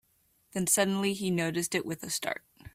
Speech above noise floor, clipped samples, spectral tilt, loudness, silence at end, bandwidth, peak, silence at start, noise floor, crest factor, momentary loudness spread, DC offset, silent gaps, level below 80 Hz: 40 dB; under 0.1%; -3.5 dB/octave; -30 LUFS; 0.05 s; 16 kHz; -12 dBFS; 0.55 s; -70 dBFS; 20 dB; 11 LU; under 0.1%; none; -66 dBFS